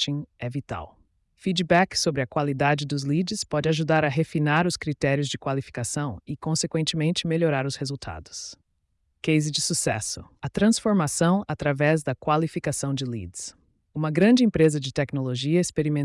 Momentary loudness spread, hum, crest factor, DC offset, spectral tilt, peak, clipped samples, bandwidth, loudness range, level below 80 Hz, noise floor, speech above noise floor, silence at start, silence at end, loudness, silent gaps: 12 LU; none; 16 dB; under 0.1%; -5 dB/octave; -8 dBFS; under 0.1%; 12 kHz; 3 LU; -54 dBFS; -72 dBFS; 48 dB; 0 s; 0 s; -24 LUFS; none